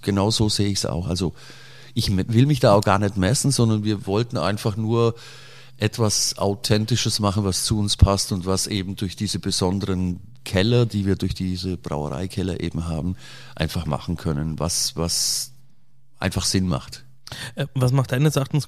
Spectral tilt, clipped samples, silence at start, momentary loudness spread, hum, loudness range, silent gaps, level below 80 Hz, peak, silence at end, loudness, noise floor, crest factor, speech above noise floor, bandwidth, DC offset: -5 dB/octave; under 0.1%; 0 s; 10 LU; none; 5 LU; none; -38 dBFS; -2 dBFS; 0 s; -22 LUFS; -61 dBFS; 20 dB; 39 dB; 15.5 kHz; under 0.1%